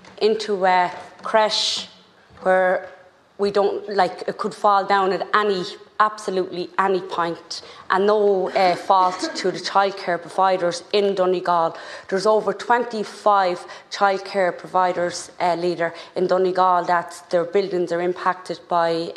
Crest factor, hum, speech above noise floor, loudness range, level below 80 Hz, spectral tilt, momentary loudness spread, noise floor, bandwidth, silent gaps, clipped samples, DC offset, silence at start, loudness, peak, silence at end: 20 dB; none; 28 dB; 2 LU; -70 dBFS; -4 dB/octave; 9 LU; -48 dBFS; 12 kHz; none; under 0.1%; under 0.1%; 0.15 s; -21 LUFS; 0 dBFS; 0 s